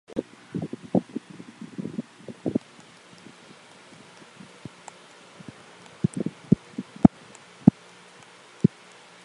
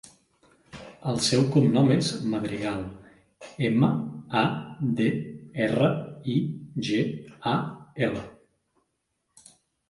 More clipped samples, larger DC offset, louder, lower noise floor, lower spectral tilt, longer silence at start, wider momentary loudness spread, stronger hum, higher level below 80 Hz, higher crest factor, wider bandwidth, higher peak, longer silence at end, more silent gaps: neither; neither; about the same, -26 LUFS vs -26 LUFS; second, -50 dBFS vs -77 dBFS; first, -8 dB/octave vs -6 dB/octave; second, 0.15 s vs 0.75 s; first, 27 LU vs 15 LU; neither; first, -54 dBFS vs -60 dBFS; first, 28 dB vs 18 dB; about the same, 11 kHz vs 11.5 kHz; first, 0 dBFS vs -8 dBFS; second, 0.55 s vs 1.6 s; neither